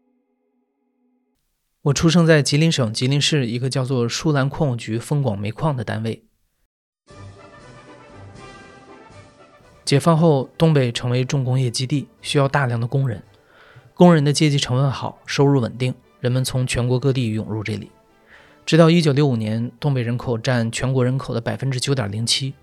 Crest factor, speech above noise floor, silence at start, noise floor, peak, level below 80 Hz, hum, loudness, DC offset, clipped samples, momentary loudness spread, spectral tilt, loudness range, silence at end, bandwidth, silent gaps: 20 dB; 52 dB; 1.85 s; -70 dBFS; 0 dBFS; -48 dBFS; none; -19 LUFS; under 0.1%; under 0.1%; 11 LU; -5.5 dB/octave; 7 LU; 0.1 s; 13 kHz; 6.66-6.93 s